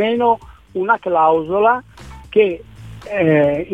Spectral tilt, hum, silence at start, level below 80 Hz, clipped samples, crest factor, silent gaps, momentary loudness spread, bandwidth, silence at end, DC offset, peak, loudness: -7.5 dB/octave; none; 0 s; -46 dBFS; under 0.1%; 14 dB; none; 11 LU; 9 kHz; 0 s; 0.2%; -2 dBFS; -16 LUFS